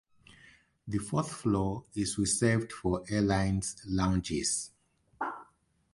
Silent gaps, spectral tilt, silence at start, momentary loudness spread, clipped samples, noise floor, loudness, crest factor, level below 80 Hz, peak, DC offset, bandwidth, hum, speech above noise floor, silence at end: none; -5 dB/octave; 0.3 s; 11 LU; under 0.1%; -68 dBFS; -31 LUFS; 18 dB; -50 dBFS; -14 dBFS; under 0.1%; 11.5 kHz; none; 37 dB; 0.5 s